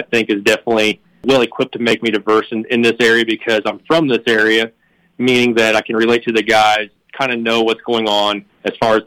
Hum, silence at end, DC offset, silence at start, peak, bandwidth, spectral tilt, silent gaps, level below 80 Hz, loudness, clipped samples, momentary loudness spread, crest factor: none; 0.05 s; under 0.1%; 0 s; -4 dBFS; 16.5 kHz; -4 dB/octave; none; -54 dBFS; -15 LUFS; under 0.1%; 7 LU; 12 dB